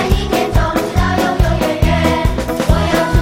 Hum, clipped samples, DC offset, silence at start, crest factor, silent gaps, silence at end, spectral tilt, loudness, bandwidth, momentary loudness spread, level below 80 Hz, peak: none; under 0.1%; under 0.1%; 0 s; 14 dB; none; 0 s; -6 dB/octave; -15 LUFS; 16.5 kHz; 2 LU; -20 dBFS; 0 dBFS